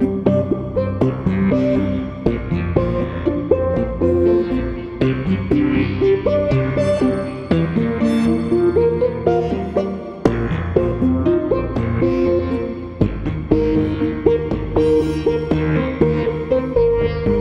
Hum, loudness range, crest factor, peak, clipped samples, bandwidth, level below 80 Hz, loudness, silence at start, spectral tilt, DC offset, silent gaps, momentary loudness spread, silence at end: none; 1 LU; 18 dB; 0 dBFS; under 0.1%; 10.5 kHz; -32 dBFS; -18 LUFS; 0 s; -9 dB/octave; under 0.1%; none; 5 LU; 0 s